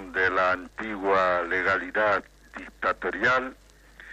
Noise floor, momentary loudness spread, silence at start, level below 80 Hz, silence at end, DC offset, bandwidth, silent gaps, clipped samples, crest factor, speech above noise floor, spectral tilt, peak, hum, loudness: -49 dBFS; 14 LU; 0 s; -54 dBFS; 0 s; under 0.1%; 10.5 kHz; none; under 0.1%; 14 dB; 23 dB; -5 dB/octave; -12 dBFS; none; -25 LUFS